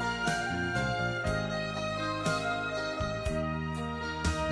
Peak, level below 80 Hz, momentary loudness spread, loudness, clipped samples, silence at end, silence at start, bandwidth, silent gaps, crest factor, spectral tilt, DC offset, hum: -18 dBFS; -44 dBFS; 3 LU; -32 LUFS; under 0.1%; 0 s; 0 s; 11 kHz; none; 14 dB; -5 dB/octave; under 0.1%; none